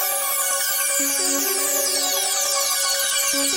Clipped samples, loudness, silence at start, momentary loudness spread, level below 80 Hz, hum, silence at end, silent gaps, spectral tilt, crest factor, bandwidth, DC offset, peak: under 0.1%; -18 LUFS; 0 s; 1 LU; -62 dBFS; none; 0 s; none; 2 dB/octave; 12 dB; 17 kHz; under 0.1%; -8 dBFS